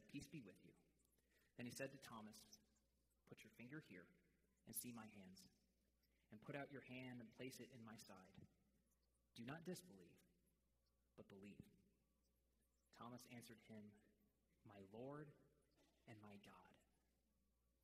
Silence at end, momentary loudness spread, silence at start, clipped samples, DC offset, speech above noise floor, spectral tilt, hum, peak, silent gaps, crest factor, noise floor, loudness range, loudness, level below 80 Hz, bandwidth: 0.9 s; 13 LU; 0 s; under 0.1%; under 0.1%; 27 dB; -4.5 dB/octave; none; -38 dBFS; none; 26 dB; -87 dBFS; 6 LU; -60 LUFS; -88 dBFS; 15.5 kHz